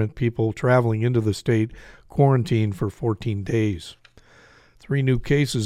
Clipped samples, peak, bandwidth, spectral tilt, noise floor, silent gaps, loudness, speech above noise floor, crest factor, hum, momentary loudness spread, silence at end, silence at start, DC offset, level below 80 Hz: under 0.1%; -6 dBFS; 13 kHz; -7 dB/octave; -52 dBFS; none; -22 LUFS; 31 dB; 18 dB; none; 8 LU; 0 s; 0 s; under 0.1%; -44 dBFS